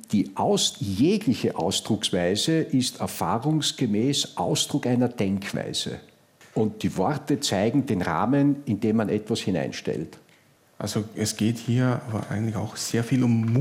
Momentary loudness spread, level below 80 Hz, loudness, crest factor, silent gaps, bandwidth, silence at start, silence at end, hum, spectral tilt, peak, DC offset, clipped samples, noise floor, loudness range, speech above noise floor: 7 LU; -64 dBFS; -25 LUFS; 14 dB; none; 16 kHz; 0.1 s; 0 s; none; -5 dB/octave; -10 dBFS; under 0.1%; under 0.1%; -58 dBFS; 4 LU; 34 dB